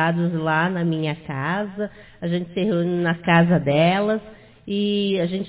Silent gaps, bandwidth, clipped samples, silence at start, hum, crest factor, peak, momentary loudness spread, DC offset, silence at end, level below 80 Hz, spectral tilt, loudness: none; 4 kHz; under 0.1%; 0 s; none; 18 dB; -4 dBFS; 10 LU; under 0.1%; 0 s; -56 dBFS; -11 dB/octave; -21 LUFS